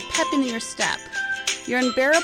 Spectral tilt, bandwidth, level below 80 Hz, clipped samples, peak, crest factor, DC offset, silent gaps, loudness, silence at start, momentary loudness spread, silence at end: -1.5 dB/octave; 16 kHz; -56 dBFS; under 0.1%; -6 dBFS; 16 dB; under 0.1%; none; -23 LUFS; 0 s; 6 LU; 0 s